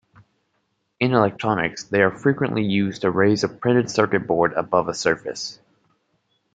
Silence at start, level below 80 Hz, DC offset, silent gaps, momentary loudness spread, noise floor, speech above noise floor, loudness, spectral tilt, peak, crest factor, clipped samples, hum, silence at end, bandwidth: 1 s; -60 dBFS; under 0.1%; none; 5 LU; -71 dBFS; 51 dB; -21 LUFS; -5.5 dB/octave; -2 dBFS; 20 dB; under 0.1%; none; 1 s; 9.2 kHz